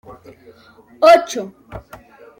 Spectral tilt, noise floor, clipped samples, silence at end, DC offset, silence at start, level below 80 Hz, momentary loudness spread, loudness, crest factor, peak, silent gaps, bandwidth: -3.5 dB/octave; -47 dBFS; under 0.1%; 0.6 s; under 0.1%; 1 s; -50 dBFS; 25 LU; -14 LUFS; 18 dB; 0 dBFS; none; 16 kHz